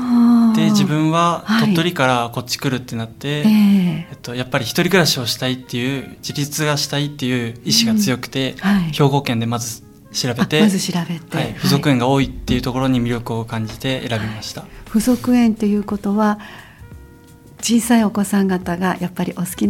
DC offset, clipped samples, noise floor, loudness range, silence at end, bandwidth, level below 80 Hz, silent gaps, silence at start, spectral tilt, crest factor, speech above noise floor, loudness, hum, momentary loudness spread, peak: under 0.1%; under 0.1%; -43 dBFS; 3 LU; 0 s; 16.5 kHz; -44 dBFS; none; 0 s; -5 dB/octave; 18 dB; 25 dB; -18 LUFS; none; 10 LU; 0 dBFS